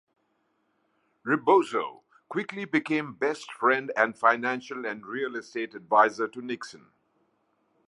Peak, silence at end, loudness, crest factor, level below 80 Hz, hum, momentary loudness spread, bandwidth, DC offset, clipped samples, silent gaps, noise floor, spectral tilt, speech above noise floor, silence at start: -6 dBFS; 1.15 s; -27 LUFS; 22 dB; -82 dBFS; none; 13 LU; 11.5 kHz; under 0.1%; under 0.1%; none; -73 dBFS; -5 dB/octave; 46 dB; 1.25 s